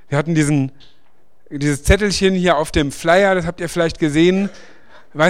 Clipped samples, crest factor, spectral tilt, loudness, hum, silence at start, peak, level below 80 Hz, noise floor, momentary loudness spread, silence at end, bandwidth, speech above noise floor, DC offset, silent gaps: under 0.1%; 18 dB; -5.5 dB/octave; -17 LUFS; none; 0.1 s; 0 dBFS; -30 dBFS; -60 dBFS; 9 LU; 0 s; 15.5 kHz; 44 dB; 1%; none